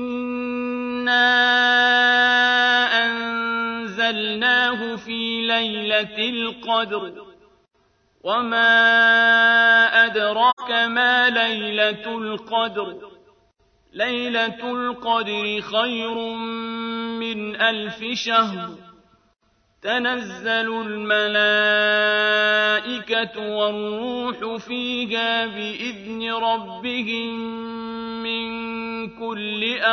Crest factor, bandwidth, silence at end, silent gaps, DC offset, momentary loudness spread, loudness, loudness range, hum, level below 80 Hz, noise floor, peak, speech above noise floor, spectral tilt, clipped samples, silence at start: 18 dB; 6.6 kHz; 0 s; 10.53-10.57 s; under 0.1%; 13 LU; -20 LUFS; 9 LU; none; -64 dBFS; -64 dBFS; -4 dBFS; 43 dB; -3.5 dB/octave; under 0.1%; 0 s